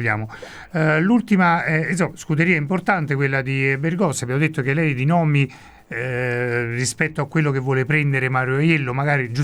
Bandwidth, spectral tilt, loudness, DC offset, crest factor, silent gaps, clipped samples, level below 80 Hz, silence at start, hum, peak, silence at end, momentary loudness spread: 13 kHz; -6 dB/octave; -20 LUFS; under 0.1%; 18 dB; none; under 0.1%; -54 dBFS; 0 s; none; -2 dBFS; 0 s; 6 LU